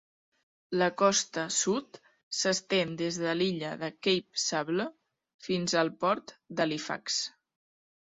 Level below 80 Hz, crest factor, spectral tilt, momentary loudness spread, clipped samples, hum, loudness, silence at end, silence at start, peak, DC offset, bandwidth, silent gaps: -72 dBFS; 20 dB; -3 dB/octave; 9 LU; under 0.1%; none; -30 LUFS; 0.9 s; 0.7 s; -10 dBFS; under 0.1%; 8.4 kHz; 2.23-2.31 s, 5.34-5.39 s